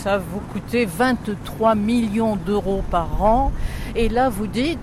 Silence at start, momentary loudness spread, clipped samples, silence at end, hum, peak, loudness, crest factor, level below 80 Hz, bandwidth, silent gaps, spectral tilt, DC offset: 0 s; 8 LU; under 0.1%; 0 s; none; -6 dBFS; -21 LUFS; 14 dB; -30 dBFS; 15.5 kHz; none; -6.5 dB/octave; under 0.1%